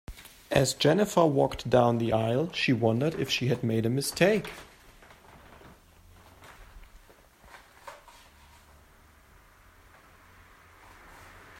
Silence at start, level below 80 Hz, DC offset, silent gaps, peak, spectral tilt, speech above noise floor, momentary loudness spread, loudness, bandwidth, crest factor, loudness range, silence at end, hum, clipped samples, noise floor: 0.1 s; -56 dBFS; under 0.1%; none; -6 dBFS; -5.5 dB/octave; 32 dB; 24 LU; -26 LUFS; 16 kHz; 24 dB; 7 LU; 0.2 s; none; under 0.1%; -57 dBFS